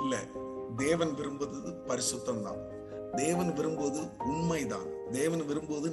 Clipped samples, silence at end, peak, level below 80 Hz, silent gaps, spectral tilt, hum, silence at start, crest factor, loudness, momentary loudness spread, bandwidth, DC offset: under 0.1%; 0 s; -16 dBFS; -60 dBFS; none; -4.5 dB/octave; none; 0 s; 18 dB; -34 LUFS; 10 LU; 13 kHz; under 0.1%